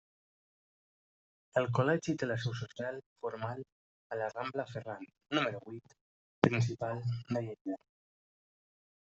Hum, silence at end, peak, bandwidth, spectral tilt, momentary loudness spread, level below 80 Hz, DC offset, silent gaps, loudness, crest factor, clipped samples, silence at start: none; 1.35 s; -6 dBFS; 8 kHz; -5.5 dB/octave; 15 LU; -72 dBFS; under 0.1%; 3.06-3.16 s, 3.72-4.10 s, 6.01-6.42 s, 7.61-7.65 s; -36 LUFS; 32 dB; under 0.1%; 1.55 s